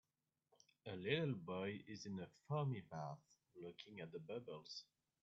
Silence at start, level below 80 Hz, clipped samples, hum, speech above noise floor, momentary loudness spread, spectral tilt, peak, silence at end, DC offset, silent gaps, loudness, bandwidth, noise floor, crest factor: 0.85 s; -86 dBFS; under 0.1%; none; 41 dB; 15 LU; -5 dB/octave; -24 dBFS; 0.4 s; under 0.1%; none; -48 LUFS; 7.6 kHz; -88 dBFS; 24 dB